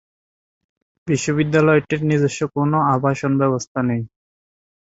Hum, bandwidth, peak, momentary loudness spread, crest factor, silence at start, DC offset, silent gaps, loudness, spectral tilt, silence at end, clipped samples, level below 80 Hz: none; 8 kHz; -2 dBFS; 7 LU; 18 dB; 1.05 s; under 0.1%; 3.67-3.75 s; -19 LUFS; -6.5 dB/octave; 0.75 s; under 0.1%; -56 dBFS